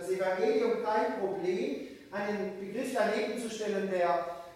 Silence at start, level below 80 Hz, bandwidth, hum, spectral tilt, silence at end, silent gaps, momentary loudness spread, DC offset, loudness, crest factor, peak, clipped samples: 0 s; -72 dBFS; 15.5 kHz; none; -5 dB/octave; 0 s; none; 8 LU; under 0.1%; -32 LUFS; 16 dB; -16 dBFS; under 0.1%